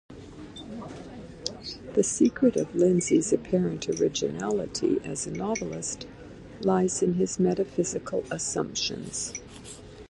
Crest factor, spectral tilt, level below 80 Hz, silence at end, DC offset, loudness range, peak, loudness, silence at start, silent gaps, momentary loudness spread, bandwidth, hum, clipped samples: 18 dB; -4.5 dB/octave; -54 dBFS; 0.05 s; under 0.1%; 4 LU; -8 dBFS; -27 LUFS; 0.1 s; none; 20 LU; 11.5 kHz; none; under 0.1%